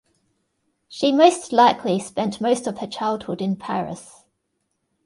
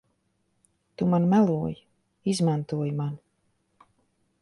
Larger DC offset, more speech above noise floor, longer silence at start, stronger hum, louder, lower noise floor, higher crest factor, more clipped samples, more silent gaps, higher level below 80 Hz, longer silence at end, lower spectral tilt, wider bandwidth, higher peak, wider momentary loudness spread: neither; first, 54 dB vs 48 dB; about the same, 0.9 s vs 1 s; neither; first, -20 LUFS vs -26 LUFS; about the same, -74 dBFS vs -73 dBFS; about the same, 22 dB vs 18 dB; neither; neither; about the same, -64 dBFS vs -62 dBFS; second, 1 s vs 1.25 s; second, -5 dB/octave vs -7.5 dB/octave; about the same, 11.5 kHz vs 11.5 kHz; first, 0 dBFS vs -10 dBFS; about the same, 13 LU vs 13 LU